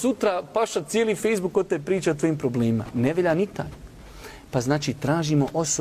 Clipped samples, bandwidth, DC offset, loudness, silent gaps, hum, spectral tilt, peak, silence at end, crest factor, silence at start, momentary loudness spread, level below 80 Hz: under 0.1%; 15.5 kHz; under 0.1%; -24 LUFS; none; none; -5.5 dB/octave; -10 dBFS; 0 s; 14 dB; 0 s; 11 LU; -50 dBFS